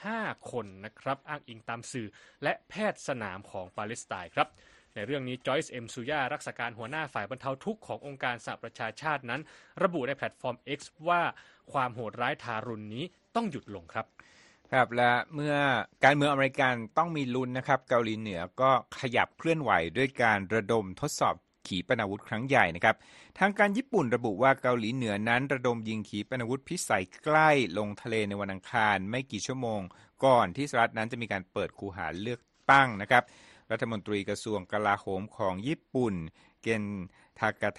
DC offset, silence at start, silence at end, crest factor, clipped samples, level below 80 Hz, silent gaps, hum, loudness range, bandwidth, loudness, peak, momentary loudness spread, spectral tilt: under 0.1%; 0 s; 0.05 s; 24 dB; under 0.1%; -66 dBFS; none; none; 8 LU; 11.5 kHz; -30 LUFS; -6 dBFS; 14 LU; -5 dB/octave